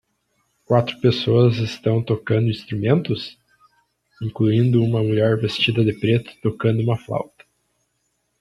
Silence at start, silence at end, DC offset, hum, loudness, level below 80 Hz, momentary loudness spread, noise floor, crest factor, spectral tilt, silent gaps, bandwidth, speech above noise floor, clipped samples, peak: 0.7 s; 1.15 s; under 0.1%; none; -20 LUFS; -54 dBFS; 11 LU; -71 dBFS; 18 dB; -8 dB/octave; none; 10.5 kHz; 52 dB; under 0.1%; -2 dBFS